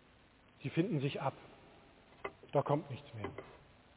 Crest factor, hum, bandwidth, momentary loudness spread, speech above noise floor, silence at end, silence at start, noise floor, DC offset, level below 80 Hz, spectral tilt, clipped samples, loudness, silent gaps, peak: 22 dB; none; 4 kHz; 22 LU; 28 dB; 0.4 s; 0.6 s; -65 dBFS; under 0.1%; -70 dBFS; -6.5 dB/octave; under 0.1%; -39 LUFS; none; -18 dBFS